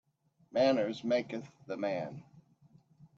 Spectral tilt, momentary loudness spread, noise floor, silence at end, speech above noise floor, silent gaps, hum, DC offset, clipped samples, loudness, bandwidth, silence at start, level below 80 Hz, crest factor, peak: -6 dB/octave; 15 LU; -70 dBFS; 0.8 s; 37 dB; none; none; under 0.1%; under 0.1%; -34 LUFS; 7.6 kHz; 0.55 s; -78 dBFS; 18 dB; -18 dBFS